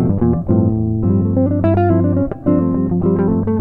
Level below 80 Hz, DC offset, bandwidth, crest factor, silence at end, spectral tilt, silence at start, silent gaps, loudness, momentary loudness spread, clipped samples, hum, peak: -34 dBFS; 1%; 3 kHz; 12 dB; 0 s; -13 dB/octave; 0 s; none; -16 LUFS; 3 LU; under 0.1%; none; -2 dBFS